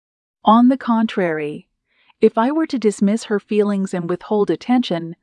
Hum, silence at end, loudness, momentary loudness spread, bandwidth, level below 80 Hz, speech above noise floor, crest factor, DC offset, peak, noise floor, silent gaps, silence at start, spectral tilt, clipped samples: none; 0.1 s; -18 LUFS; 9 LU; 10.5 kHz; -68 dBFS; 42 dB; 16 dB; under 0.1%; -2 dBFS; -60 dBFS; none; 0.45 s; -6.5 dB/octave; under 0.1%